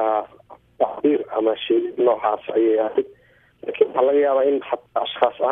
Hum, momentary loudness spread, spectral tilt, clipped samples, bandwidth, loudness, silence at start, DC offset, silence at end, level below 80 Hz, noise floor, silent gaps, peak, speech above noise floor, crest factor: none; 8 LU; -7.5 dB/octave; under 0.1%; 3.8 kHz; -21 LUFS; 0 s; under 0.1%; 0 s; -66 dBFS; -48 dBFS; none; -4 dBFS; 28 dB; 18 dB